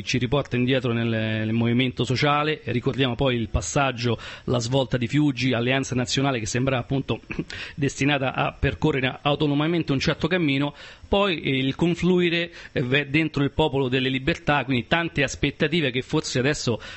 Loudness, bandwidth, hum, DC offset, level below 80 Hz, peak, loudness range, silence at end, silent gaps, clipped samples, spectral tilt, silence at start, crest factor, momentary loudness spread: -23 LUFS; 8.6 kHz; none; under 0.1%; -42 dBFS; -6 dBFS; 2 LU; 0 s; none; under 0.1%; -5.5 dB/octave; 0 s; 18 dB; 5 LU